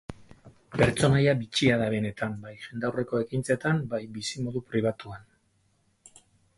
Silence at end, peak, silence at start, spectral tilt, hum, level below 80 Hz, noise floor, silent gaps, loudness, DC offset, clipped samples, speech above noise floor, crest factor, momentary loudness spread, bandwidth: 1.35 s; -8 dBFS; 0.1 s; -5.5 dB/octave; none; -54 dBFS; -69 dBFS; none; -27 LUFS; under 0.1%; under 0.1%; 42 dB; 20 dB; 17 LU; 11.5 kHz